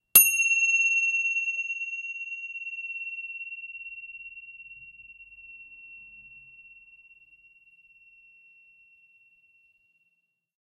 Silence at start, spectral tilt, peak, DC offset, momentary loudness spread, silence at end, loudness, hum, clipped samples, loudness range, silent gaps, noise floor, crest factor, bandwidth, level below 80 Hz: 0.15 s; 2.5 dB/octave; -2 dBFS; under 0.1%; 26 LU; 3.9 s; -24 LUFS; none; under 0.1%; 24 LU; none; -75 dBFS; 28 dB; 14.5 kHz; -72 dBFS